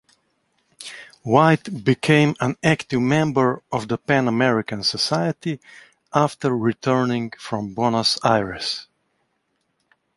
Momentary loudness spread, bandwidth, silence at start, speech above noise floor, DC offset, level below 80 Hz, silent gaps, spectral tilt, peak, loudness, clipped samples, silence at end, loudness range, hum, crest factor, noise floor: 12 LU; 11.5 kHz; 0.8 s; 51 dB; under 0.1%; -56 dBFS; none; -5.5 dB/octave; -2 dBFS; -20 LUFS; under 0.1%; 1.35 s; 3 LU; none; 20 dB; -71 dBFS